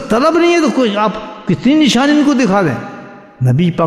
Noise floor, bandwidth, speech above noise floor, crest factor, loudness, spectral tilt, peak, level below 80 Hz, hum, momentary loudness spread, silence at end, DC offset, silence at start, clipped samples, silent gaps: -33 dBFS; 13 kHz; 21 dB; 12 dB; -12 LUFS; -6 dB/octave; 0 dBFS; -46 dBFS; none; 12 LU; 0 s; 0.1%; 0 s; under 0.1%; none